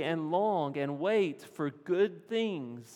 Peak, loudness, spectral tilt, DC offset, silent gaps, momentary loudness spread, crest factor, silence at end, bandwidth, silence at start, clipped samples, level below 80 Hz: -18 dBFS; -32 LUFS; -6.5 dB/octave; under 0.1%; none; 8 LU; 14 dB; 0 s; 14 kHz; 0 s; under 0.1%; under -90 dBFS